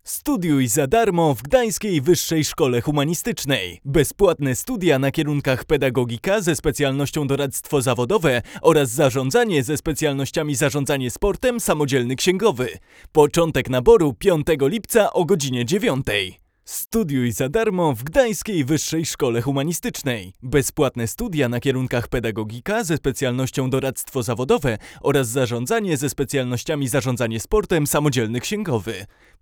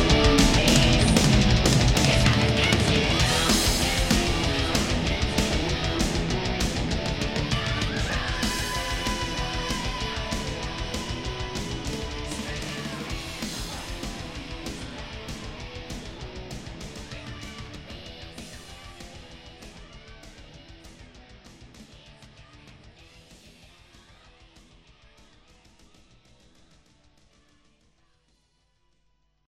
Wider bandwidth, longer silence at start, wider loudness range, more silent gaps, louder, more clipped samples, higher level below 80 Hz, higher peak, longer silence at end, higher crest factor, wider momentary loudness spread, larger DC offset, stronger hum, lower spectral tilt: first, over 20 kHz vs 16 kHz; about the same, 0.05 s vs 0 s; second, 4 LU vs 23 LU; neither; first, -20 LUFS vs -24 LUFS; neither; second, -40 dBFS vs -34 dBFS; first, 0 dBFS vs -4 dBFS; second, 0.35 s vs 6 s; about the same, 20 dB vs 24 dB; second, 6 LU vs 21 LU; neither; neither; about the same, -5 dB/octave vs -4 dB/octave